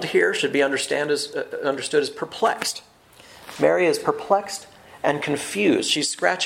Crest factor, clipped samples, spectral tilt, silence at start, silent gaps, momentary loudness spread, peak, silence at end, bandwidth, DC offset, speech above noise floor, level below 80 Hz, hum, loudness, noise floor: 20 dB; under 0.1%; -3 dB/octave; 0 s; none; 9 LU; -2 dBFS; 0 s; 16.5 kHz; under 0.1%; 26 dB; -66 dBFS; none; -22 LUFS; -48 dBFS